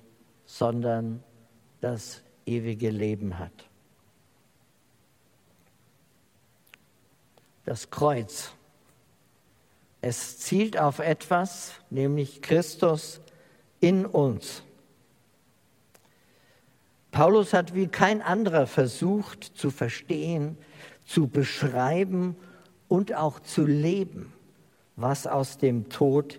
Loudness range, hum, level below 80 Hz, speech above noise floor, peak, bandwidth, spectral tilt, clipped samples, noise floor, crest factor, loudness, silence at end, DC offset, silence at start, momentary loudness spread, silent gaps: 9 LU; none; -68 dBFS; 39 dB; -2 dBFS; 16.5 kHz; -6 dB/octave; under 0.1%; -65 dBFS; 26 dB; -27 LUFS; 0 s; under 0.1%; 0.5 s; 16 LU; none